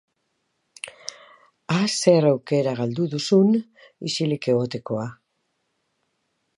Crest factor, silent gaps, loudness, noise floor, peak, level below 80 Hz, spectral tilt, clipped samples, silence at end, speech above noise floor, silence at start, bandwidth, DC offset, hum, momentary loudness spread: 22 dB; none; -22 LUFS; -74 dBFS; -2 dBFS; -68 dBFS; -5.5 dB/octave; under 0.1%; 1.45 s; 52 dB; 0.85 s; 11.5 kHz; under 0.1%; none; 17 LU